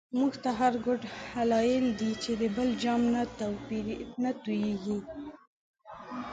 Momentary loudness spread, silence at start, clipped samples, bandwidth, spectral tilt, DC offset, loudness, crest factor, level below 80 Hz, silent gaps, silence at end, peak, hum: 14 LU; 0.1 s; under 0.1%; 9.2 kHz; -5.5 dB/octave; under 0.1%; -31 LUFS; 16 dB; -58 dBFS; 5.47-5.74 s; 0 s; -14 dBFS; none